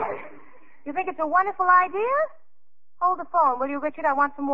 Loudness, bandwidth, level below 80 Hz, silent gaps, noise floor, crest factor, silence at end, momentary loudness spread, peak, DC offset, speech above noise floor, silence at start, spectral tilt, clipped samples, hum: -23 LUFS; 5.2 kHz; -72 dBFS; none; -84 dBFS; 18 dB; 0 s; 12 LU; -6 dBFS; 1%; 61 dB; 0 s; -3 dB/octave; under 0.1%; none